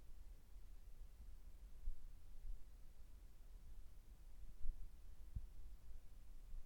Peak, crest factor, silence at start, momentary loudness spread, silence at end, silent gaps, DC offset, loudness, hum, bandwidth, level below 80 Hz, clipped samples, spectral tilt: -30 dBFS; 20 dB; 0 s; 9 LU; 0 s; none; under 0.1%; -62 LUFS; none; 7.8 kHz; -54 dBFS; under 0.1%; -5.5 dB/octave